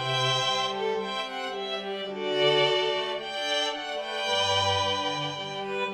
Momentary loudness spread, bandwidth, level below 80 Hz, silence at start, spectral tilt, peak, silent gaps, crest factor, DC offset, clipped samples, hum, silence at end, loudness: 9 LU; 16 kHz; -72 dBFS; 0 s; -3 dB/octave; -10 dBFS; none; 18 dB; under 0.1%; under 0.1%; none; 0 s; -27 LUFS